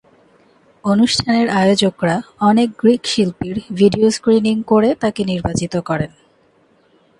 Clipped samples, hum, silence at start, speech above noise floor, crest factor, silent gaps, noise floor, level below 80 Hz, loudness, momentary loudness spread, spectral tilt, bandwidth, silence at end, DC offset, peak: under 0.1%; none; 0.85 s; 40 dB; 16 dB; none; -55 dBFS; -46 dBFS; -16 LUFS; 8 LU; -5.5 dB/octave; 11.5 kHz; 1.15 s; under 0.1%; 0 dBFS